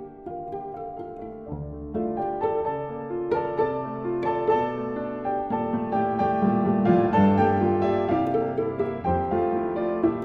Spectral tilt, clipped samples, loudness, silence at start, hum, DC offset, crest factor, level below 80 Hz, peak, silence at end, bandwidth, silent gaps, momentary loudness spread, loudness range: -10 dB/octave; under 0.1%; -25 LUFS; 0 s; none; under 0.1%; 18 dB; -52 dBFS; -8 dBFS; 0 s; 6 kHz; none; 15 LU; 7 LU